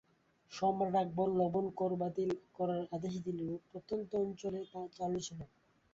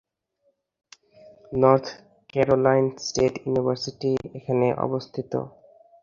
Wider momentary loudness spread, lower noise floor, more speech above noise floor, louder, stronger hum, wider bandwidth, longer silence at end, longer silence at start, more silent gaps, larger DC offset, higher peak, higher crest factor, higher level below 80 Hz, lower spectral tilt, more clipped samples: about the same, 12 LU vs 12 LU; about the same, -68 dBFS vs -70 dBFS; second, 31 dB vs 48 dB; second, -37 LUFS vs -24 LUFS; neither; about the same, 7.6 kHz vs 7.4 kHz; about the same, 0.45 s vs 0.55 s; second, 0.5 s vs 1.5 s; neither; neither; second, -22 dBFS vs -2 dBFS; second, 16 dB vs 22 dB; second, -70 dBFS vs -56 dBFS; about the same, -7 dB/octave vs -6 dB/octave; neither